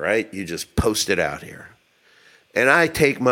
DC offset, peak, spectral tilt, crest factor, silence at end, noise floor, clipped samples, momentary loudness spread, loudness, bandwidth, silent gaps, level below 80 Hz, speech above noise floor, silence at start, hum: under 0.1%; 0 dBFS; -4 dB/octave; 20 dB; 0 s; -57 dBFS; under 0.1%; 13 LU; -20 LUFS; 17 kHz; none; -40 dBFS; 37 dB; 0 s; none